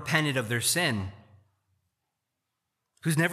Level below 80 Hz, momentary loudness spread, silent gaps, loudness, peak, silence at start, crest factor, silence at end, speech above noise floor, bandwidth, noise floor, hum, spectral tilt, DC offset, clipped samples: -68 dBFS; 10 LU; none; -27 LUFS; -8 dBFS; 0 s; 22 dB; 0 s; 57 dB; 15 kHz; -83 dBFS; none; -3.5 dB/octave; under 0.1%; under 0.1%